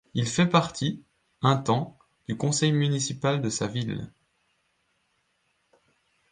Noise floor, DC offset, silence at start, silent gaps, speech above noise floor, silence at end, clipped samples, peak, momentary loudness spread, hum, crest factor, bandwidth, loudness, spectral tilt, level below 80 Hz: -72 dBFS; under 0.1%; 0.15 s; none; 47 dB; 2.25 s; under 0.1%; -6 dBFS; 14 LU; none; 22 dB; 9.8 kHz; -26 LUFS; -5 dB/octave; -62 dBFS